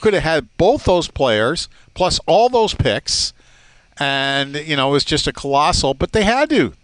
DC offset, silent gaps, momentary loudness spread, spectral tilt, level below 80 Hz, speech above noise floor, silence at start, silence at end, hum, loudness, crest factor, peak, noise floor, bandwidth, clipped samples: under 0.1%; none; 6 LU; -4 dB/octave; -34 dBFS; 32 dB; 0 s; 0.1 s; none; -17 LUFS; 14 dB; -4 dBFS; -49 dBFS; 10.5 kHz; under 0.1%